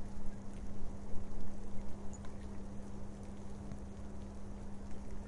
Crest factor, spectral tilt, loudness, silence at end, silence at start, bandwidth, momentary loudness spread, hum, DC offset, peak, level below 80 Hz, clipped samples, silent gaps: 14 dB; -7 dB/octave; -49 LUFS; 0 s; 0 s; 10.5 kHz; 1 LU; none; under 0.1%; -20 dBFS; -48 dBFS; under 0.1%; none